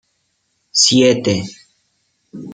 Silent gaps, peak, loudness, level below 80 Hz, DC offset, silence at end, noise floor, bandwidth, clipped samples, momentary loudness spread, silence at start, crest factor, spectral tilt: none; -2 dBFS; -13 LUFS; -58 dBFS; under 0.1%; 0 s; -67 dBFS; 9.6 kHz; under 0.1%; 21 LU; 0.75 s; 18 dB; -3 dB/octave